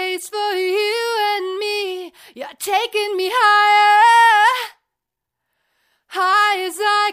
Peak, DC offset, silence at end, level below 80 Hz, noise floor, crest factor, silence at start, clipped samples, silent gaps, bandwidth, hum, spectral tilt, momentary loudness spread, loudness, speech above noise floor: -2 dBFS; under 0.1%; 0 s; -74 dBFS; -82 dBFS; 14 dB; 0 s; under 0.1%; none; 15.5 kHz; none; 0.5 dB/octave; 18 LU; -16 LUFS; 67 dB